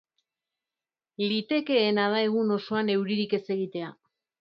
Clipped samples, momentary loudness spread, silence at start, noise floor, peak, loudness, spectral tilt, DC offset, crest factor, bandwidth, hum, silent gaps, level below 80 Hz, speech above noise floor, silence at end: under 0.1%; 8 LU; 1.2 s; under -90 dBFS; -10 dBFS; -27 LUFS; -8 dB/octave; under 0.1%; 18 dB; 5.8 kHz; none; none; -78 dBFS; over 64 dB; 0.5 s